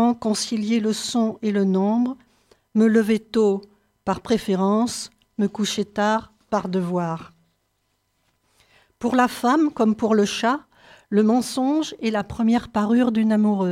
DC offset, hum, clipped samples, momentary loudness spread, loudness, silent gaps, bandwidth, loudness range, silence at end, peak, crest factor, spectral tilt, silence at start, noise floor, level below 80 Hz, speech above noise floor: under 0.1%; none; under 0.1%; 8 LU; -22 LUFS; none; 14.5 kHz; 5 LU; 0 s; -6 dBFS; 16 dB; -5.5 dB/octave; 0 s; -71 dBFS; -58 dBFS; 50 dB